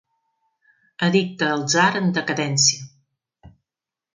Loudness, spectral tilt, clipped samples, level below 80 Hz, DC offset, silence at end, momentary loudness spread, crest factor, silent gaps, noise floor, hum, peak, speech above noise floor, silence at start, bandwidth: -19 LUFS; -3 dB/octave; under 0.1%; -64 dBFS; under 0.1%; 0.65 s; 6 LU; 20 dB; none; -89 dBFS; none; -4 dBFS; 69 dB; 1 s; 9.6 kHz